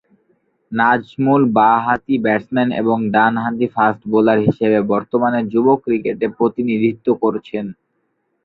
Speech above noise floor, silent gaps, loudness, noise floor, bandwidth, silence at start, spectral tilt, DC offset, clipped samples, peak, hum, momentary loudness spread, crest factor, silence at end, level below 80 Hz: 52 dB; none; -16 LUFS; -68 dBFS; 4.7 kHz; 0.7 s; -9.5 dB/octave; under 0.1%; under 0.1%; -2 dBFS; none; 6 LU; 16 dB; 0.75 s; -56 dBFS